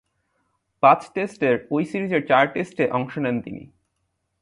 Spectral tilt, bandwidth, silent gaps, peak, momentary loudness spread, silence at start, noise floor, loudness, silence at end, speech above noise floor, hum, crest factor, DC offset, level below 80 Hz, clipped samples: -7 dB/octave; 11.5 kHz; none; -2 dBFS; 11 LU; 0.85 s; -74 dBFS; -21 LUFS; 0.75 s; 53 dB; none; 22 dB; under 0.1%; -62 dBFS; under 0.1%